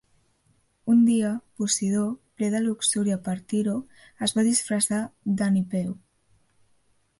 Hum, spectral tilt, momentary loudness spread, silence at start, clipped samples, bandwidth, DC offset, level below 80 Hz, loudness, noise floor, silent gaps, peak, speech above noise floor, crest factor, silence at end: none; -4.5 dB/octave; 9 LU; 0.85 s; under 0.1%; 11.5 kHz; under 0.1%; -66 dBFS; -25 LUFS; -66 dBFS; none; -10 dBFS; 42 dB; 16 dB; 1.25 s